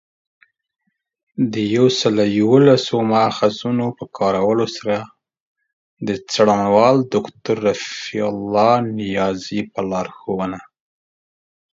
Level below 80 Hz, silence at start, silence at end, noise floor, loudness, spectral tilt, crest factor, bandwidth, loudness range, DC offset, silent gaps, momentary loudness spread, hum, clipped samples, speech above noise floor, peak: -56 dBFS; 1.35 s; 1.1 s; under -90 dBFS; -18 LUFS; -6 dB/octave; 18 dB; 7.8 kHz; 5 LU; under 0.1%; 5.40-5.55 s, 5.73-5.97 s; 11 LU; none; under 0.1%; over 73 dB; 0 dBFS